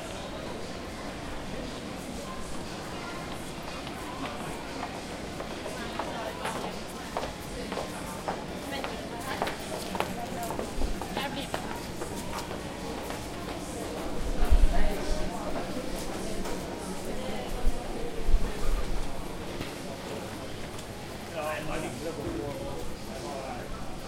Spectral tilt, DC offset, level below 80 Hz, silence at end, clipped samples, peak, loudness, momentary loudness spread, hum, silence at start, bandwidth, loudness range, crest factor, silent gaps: -4.5 dB/octave; under 0.1%; -34 dBFS; 0 s; under 0.1%; -8 dBFS; -35 LUFS; 5 LU; none; 0 s; 16 kHz; 4 LU; 22 dB; none